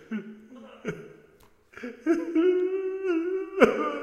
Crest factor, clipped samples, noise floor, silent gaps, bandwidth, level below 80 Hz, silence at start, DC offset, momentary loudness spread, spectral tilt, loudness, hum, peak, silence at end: 26 dB; under 0.1%; -58 dBFS; none; 12 kHz; -66 dBFS; 0.1 s; under 0.1%; 21 LU; -6 dB/octave; -26 LUFS; none; -2 dBFS; 0 s